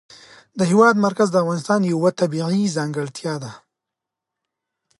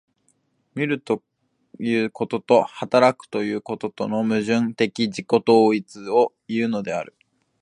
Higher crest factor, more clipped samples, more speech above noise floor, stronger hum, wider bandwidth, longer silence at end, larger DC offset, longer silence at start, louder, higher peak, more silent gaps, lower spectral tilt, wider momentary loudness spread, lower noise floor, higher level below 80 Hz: about the same, 18 dB vs 20 dB; neither; first, 66 dB vs 46 dB; neither; about the same, 11.5 kHz vs 10.5 kHz; first, 1.45 s vs 0.55 s; neither; second, 0.55 s vs 0.75 s; first, -19 LUFS vs -22 LUFS; about the same, -2 dBFS vs -2 dBFS; neither; about the same, -6 dB/octave vs -6 dB/octave; first, 13 LU vs 10 LU; first, -84 dBFS vs -67 dBFS; about the same, -68 dBFS vs -68 dBFS